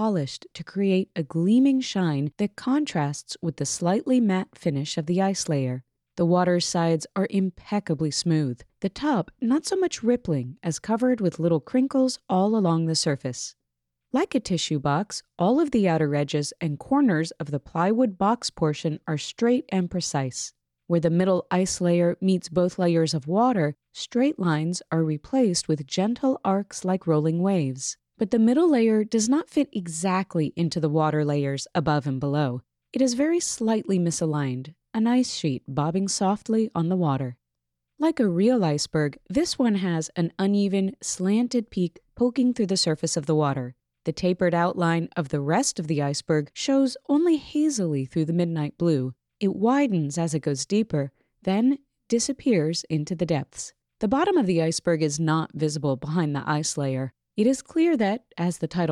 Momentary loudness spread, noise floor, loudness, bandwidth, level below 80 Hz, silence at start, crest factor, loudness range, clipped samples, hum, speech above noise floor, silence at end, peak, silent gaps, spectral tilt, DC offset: 7 LU; -83 dBFS; -24 LUFS; 12 kHz; -60 dBFS; 0 s; 16 dB; 2 LU; under 0.1%; none; 59 dB; 0 s; -8 dBFS; none; -5.5 dB/octave; under 0.1%